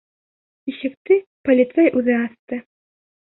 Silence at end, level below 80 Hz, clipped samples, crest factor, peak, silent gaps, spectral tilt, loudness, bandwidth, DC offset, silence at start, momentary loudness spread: 0.65 s; -64 dBFS; under 0.1%; 16 dB; -4 dBFS; 0.97-1.05 s, 1.26-1.44 s, 2.39-2.47 s; -10 dB/octave; -19 LUFS; 4.1 kHz; under 0.1%; 0.65 s; 15 LU